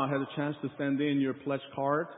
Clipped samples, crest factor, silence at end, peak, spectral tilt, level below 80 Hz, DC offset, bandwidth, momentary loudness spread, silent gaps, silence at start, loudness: under 0.1%; 16 dB; 0 s; -16 dBFS; -4 dB/octave; -76 dBFS; under 0.1%; 3.9 kHz; 6 LU; none; 0 s; -32 LUFS